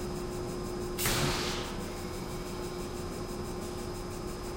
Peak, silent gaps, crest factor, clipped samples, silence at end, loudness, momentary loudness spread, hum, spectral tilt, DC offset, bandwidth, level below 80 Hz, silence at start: -16 dBFS; none; 20 dB; under 0.1%; 0 s; -35 LUFS; 9 LU; none; -4 dB/octave; under 0.1%; 16 kHz; -44 dBFS; 0 s